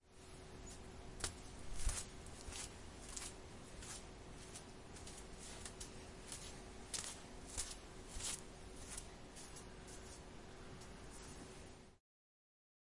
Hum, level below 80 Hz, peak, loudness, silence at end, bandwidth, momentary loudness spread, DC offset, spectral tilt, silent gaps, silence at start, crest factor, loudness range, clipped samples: none; -56 dBFS; -24 dBFS; -51 LUFS; 1 s; 11.5 kHz; 10 LU; under 0.1%; -2.5 dB/octave; none; 0 s; 28 dB; 6 LU; under 0.1%